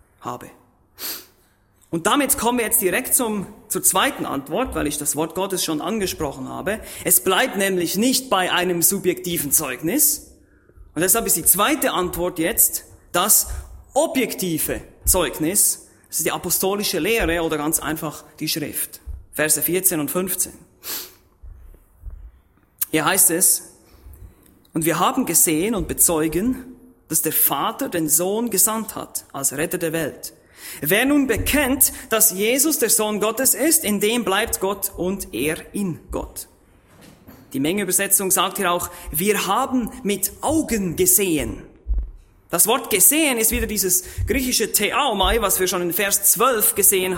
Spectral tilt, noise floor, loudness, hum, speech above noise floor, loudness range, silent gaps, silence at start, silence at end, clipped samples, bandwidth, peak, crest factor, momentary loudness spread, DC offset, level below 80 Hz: -2.5 dB/octave; -58 dBFS; -19 LUFS; none; 38 dB; 5 LU; none; 0.2 s; 0 s; under 0.1%; 16.5 kHz; 0 dBFS; 22 dB; 14 LU; under 0.1%; -40 dBFS